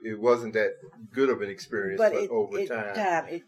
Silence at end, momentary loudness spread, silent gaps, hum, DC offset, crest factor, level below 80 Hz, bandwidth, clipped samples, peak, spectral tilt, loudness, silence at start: 0.05 s; 8 LU; none; none; under 0.1%; 16 dB; -78 dBFS; 13 kHz; under 0.1%; -10 dBFS; -5.5 dB/octave; -27 LUFS; 0.05 s